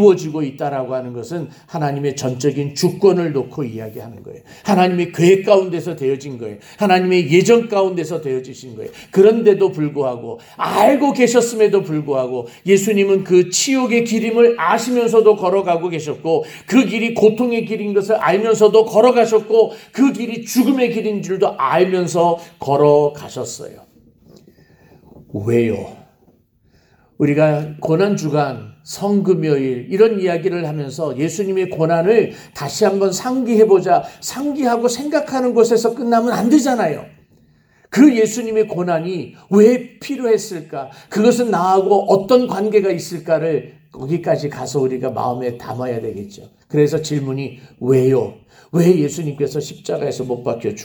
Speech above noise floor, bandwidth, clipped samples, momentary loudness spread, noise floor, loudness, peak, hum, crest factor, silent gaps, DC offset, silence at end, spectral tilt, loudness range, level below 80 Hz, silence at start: 40 dB; over 20 kHz; under 0.1%; 14 LU; -56 dBFS; -16 LUFS; 0 dBFS; none; 16 dB; none; under 0.1%; 0 s; -5.5 dB/octave; 5 LU; -60 dBFS; 0 s